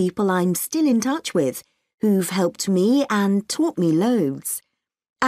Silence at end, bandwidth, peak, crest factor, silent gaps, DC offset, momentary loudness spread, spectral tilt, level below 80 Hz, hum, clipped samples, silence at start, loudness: 0 s; 15.5 kHz; -6 dBFS; 14 dB; 1.94-1.98 s, 5.10-5.16 s; under 0.1%; 7 LU; -5 dB/octave; -66 dBFS; none; under 0.1%; 0 s; -21 LUFS